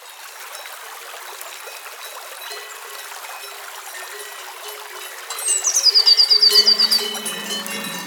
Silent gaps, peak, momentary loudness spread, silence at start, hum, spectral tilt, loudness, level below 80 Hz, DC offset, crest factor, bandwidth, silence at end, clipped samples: none; -2 dBFS; 23 LU; 0 s; none; 1.5 dB/octave; -13 LUFS; under -90 dBFS; under 0.1%; 20 dB; over 20 kHz; 0 s; under 0.1%